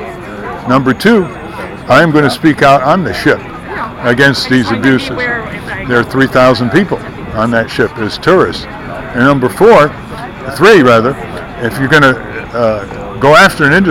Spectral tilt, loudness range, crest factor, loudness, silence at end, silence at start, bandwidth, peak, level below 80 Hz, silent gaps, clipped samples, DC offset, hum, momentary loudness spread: -6 dB/octave; 3 LU; 10 dB; -9 LUFS; 0 s; 0 s; 16.5 kHz; 0 dBFS; -36 dBFS; none; 0.9%; under 0.1%; none; 16 LU